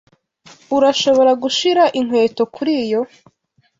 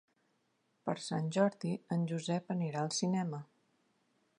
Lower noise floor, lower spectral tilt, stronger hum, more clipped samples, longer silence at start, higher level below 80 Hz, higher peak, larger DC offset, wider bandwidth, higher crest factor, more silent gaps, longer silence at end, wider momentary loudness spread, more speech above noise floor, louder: second, -47 dBFS vs -78 dBFS; second, -3.5 dB/octave vs -5.5 dB/octave; neither; neither; second, 0.7 s vs 0.85 s; first, -62 dBFS vs -84 dBFS; first, -2 dBFS vs -16 dBFS; neither; second, 7.8 kHz vs 11 kHz; second, 14 dB vs 22 dB; neither; second, 0.75 s vs 0.95 s; about the same, 8 LU vs 8 LU; second, 32 dB vs 43 dB; first, -16 LUFS vs -36 LUFS